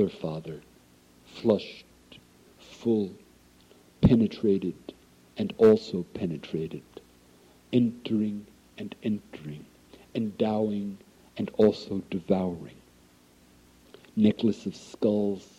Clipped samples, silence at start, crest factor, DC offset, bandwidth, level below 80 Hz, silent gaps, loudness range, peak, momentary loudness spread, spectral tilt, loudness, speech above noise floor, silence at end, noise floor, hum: under 0.1%; 0 s; 20 dB; under 0.1%; 11 kHz; -54 dBFS; none; 6 LU; -10 dBFS; 20 LU; -8 dB/octave; -28 LUFS; 32 dB; 0.15 s; -58 dBFS; none